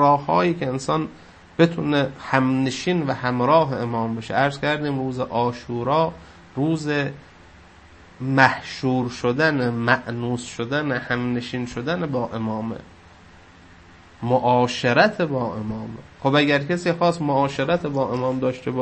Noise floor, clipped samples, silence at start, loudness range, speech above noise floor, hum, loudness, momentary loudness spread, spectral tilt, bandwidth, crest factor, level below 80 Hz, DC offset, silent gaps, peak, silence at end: -48 dBFS; under 0.1%; 0 s; 5 LU; 26 dB; none; -22 LUFS; 10 LU; -6 dB/octave; 8.8 kHz; 22 dB; -54 dBFS; under 0.1%; none; 0 dBFS; 0 s